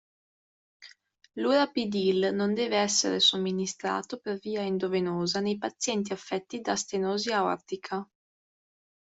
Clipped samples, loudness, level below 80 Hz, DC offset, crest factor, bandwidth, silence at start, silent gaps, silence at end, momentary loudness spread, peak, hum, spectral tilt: under 0.1%; -28 LUFS; -72 dBFS; under 0.1%; 18 dB; 8.2 kHz; 0.8 s; none; 1 s; 11 LU; -12 dBFS; none; -3.5 dB/octave